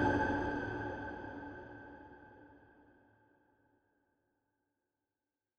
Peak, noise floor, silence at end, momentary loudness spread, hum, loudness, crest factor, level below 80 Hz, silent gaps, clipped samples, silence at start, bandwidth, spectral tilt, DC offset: -20 dBFS; under -90 dBFS; 3 s; 24 LU; none; -39 LUFS; 22 dB; -58 dBFS; none; under 0.1%; 0 s; 8.2 kHz; -7.5 dB/octave; under 0.1%